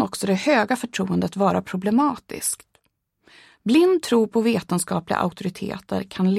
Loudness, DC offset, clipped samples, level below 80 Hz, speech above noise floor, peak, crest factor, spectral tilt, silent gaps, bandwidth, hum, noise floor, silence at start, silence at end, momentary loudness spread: -22 LUFS; under 0.1%; under 0.1%; -60 dBFS; 48 dB; -6 dBFS; 16 dB; -5 dB/octave; none; 15 kHz; none; -70 dBFS; 0 s; 0 s; 11 LU